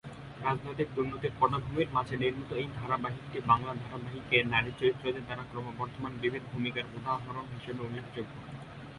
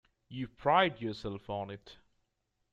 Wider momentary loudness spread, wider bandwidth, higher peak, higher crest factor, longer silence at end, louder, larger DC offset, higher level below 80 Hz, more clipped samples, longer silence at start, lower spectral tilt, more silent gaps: second, 12 LU vs 18 LU; first, 11.5 kHz vs 8.2 kHz; about the same, -10 dBFS vs -12 dBFS; about the same, 24 dB vs 22 dB; second, 0 s vs 0.8 s; about the same, -33 LUFS vs -33 LUFS; neither; first, -56 dBFS vs -62 dBFS; neither; second, 0.05 s vs 0.3 s; about the same, -7 dB/octave vs -6.5 dB/octave; neither